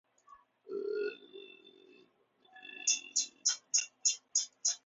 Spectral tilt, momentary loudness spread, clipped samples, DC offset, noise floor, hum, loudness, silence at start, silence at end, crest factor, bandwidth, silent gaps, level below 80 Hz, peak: 2.5 dB/octave; 22 LU; under 0.1%; under 0.1%; -69 dBFS; none; -33 LUFS; 0.3 s; 0.1 s; 24 dB; 8 kHz; none; under -90 dBFS; -16 dBFS